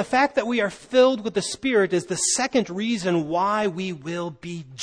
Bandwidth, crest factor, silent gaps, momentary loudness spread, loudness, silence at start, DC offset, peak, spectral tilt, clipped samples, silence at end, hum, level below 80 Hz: 10.5 kHz; 16 dB; none; 11 LU; -23 LUFS; 0 s; under 0.1%; -6 dBFS; -3.5 dB/octave; under 0.1%; 0 s; none; -60 dBFS